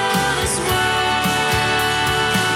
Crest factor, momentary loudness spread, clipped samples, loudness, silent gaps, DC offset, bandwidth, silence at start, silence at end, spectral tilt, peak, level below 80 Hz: 12 dB; 1 LU; under 0.1%; -17 LUFS; none; under 0.1%; 18 kHz; 0 s; 0 s; -3 dB/octave; -6 dBFS; -38 dBFS